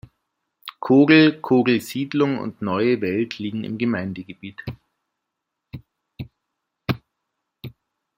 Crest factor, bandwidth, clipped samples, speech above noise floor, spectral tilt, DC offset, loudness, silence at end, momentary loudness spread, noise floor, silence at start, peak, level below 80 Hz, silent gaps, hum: 20 dB; 16 kHz; under 0.1%; 62 dB; -6.5 dB/octave; under 0.1%; -20 LUFS; 0.5 s; 26 LU; -81 dBFS; 0.65 s; -2 dBFS; -60 dBFS; none; none